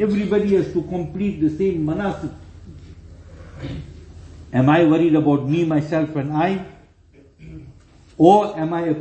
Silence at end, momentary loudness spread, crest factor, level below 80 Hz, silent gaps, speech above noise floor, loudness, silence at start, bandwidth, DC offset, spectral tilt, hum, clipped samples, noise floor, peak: 0 s; 19 LU; 20 dB; -46 dBFS; none; 33 dB; -19 LUFS; 0 s; 8.4 kHz; under 0.1%; -8.5 dB/octave; none; under 0.1%; -51 dBFS; 0 dBFS